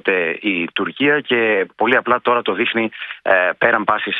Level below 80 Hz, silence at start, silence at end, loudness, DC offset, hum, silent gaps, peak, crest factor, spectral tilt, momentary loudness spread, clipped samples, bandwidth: -62 dBFS; 0.05 s; 0 s; -17 LUFS; under 0.1%; none; none; 0 dBFS; 18 dB; -7 dB/octave; 5 LU; under 0.1%; 4.7 kHz